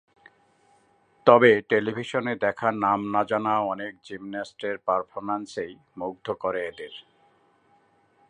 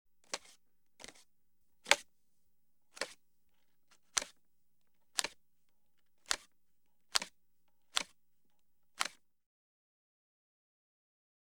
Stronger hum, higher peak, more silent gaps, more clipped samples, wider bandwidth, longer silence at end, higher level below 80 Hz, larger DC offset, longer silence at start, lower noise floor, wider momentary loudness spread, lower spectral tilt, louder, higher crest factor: neither; first, -2 dBFS vs -6 dBFS; neither; neither; second, 10 kHz vs over 20 kHz; second, 1.3 s vs 2.4 s; first, -68 dBFS vs -76 dBFS; neither; first, 1.25 s vs 0.35 s; second, -63 dBFS vs -83 dBFS; second, 17 LU vs 21 LU; first, -6 dB/octave vs 1.5 dB/octave; first, -25 LUFS vs -38 LUFS; second, 24 dB vs 38 dB